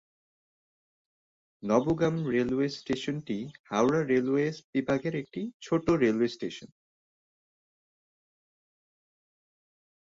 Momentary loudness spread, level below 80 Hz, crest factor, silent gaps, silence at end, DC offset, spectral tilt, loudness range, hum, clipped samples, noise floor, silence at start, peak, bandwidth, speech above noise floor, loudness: 12 LU; -62 dBFS; 20 dB; 3.59-3.64 s, 4.64-4.73 s, 5.54-5.60 s; 3.4 s; under 0.1%; -6.5 dB/octave; 5 LU; none; under 0.1%; under -90 dBFS; 1.6 s; -10 dBFS; 7.8 kHz; over 62 dB; -29 LUFS